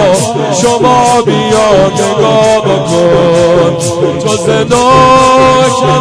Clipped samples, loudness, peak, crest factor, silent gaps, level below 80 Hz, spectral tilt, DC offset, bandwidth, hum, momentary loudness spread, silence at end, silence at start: 1%; -7 LUFS; 0 dBFS; 8 dB; none; -34 dBFS; -4.5 dB/octave; under 0.1%; 11 kHz; none; 6 LU; 0 s; 0 s